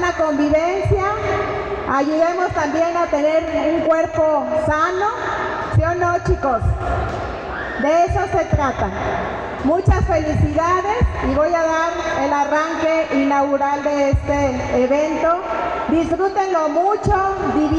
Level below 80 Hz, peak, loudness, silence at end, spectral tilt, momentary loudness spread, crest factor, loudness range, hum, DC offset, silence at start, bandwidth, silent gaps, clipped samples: -30 dBFS; -6 dBFS; -18 LUFS; 0 s; -6.5 dB/octave; 5 LU; 12 dB; 2 LU; none; under 0.1%; 0 s; 9.2 kHz; none; under 0.1%